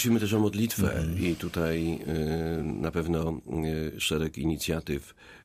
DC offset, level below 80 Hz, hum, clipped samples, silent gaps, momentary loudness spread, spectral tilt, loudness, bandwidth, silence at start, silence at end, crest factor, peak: under 0.1%; -44 dBFS; none; under 0.1%; none; 6 LU; -5.5 dB/octave; -29 LUFS; 15.5 kHz; 0 s; 0.05 s; 16 dB; -14 dBFS